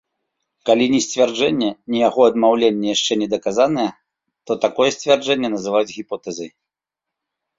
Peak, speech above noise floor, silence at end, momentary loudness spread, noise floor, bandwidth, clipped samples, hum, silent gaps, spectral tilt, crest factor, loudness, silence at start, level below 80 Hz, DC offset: -2 dBFS; 68 dB; 1.1 s; 12 LU; -85 dBFS; 7.8 kHz; under 0.1%; none; none; -3.5 dB/octave; 18 dB; -18 LUFS; 0.65 s; -62 dBFS; under 0.1%